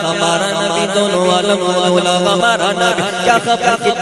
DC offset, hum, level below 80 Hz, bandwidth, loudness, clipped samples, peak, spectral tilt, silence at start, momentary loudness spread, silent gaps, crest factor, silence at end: under 0.1%; none; -52 dBFS; 13 kHz; -13 LUFS; under 0.1%; 0 dBFS; -3.5 dB/octave; 0 s; 2 LU; none; 14 dB; 0 s